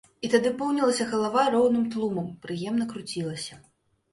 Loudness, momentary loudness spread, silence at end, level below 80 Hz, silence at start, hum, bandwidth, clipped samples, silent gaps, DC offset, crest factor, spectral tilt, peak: -26 LUFS; 11 LU; 0.55 s; -66 dBFS; 0.2 s; none; 11.5 kHz; under 0.1%; none; under 0.1%; 18 dB; -5 dB/octave; -8 dBFS